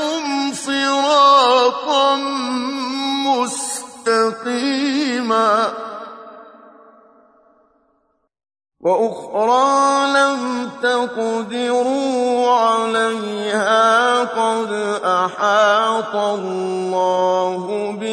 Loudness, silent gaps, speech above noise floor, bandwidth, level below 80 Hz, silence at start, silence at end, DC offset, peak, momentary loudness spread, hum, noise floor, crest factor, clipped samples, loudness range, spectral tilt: -17 LUFS; none; 47 dB; 11 kHz; -70 dBFS; 0 s; 0 s; under 0.1%; -2 dBFS; 9 LU; none; -65 dBFS; 16 dB; under 0.1%; 7 LU; -3 dB/octave